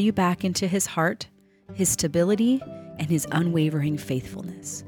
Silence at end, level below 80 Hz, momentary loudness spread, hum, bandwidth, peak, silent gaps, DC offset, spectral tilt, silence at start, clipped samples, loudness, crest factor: 0 s; -56 dBFS; 14 LU; none; 19 kHz; -10 dBFS; none; under 0.1%; -5 dB/octave; 0 s; under 0.1%; -24 LUFS; 14 dB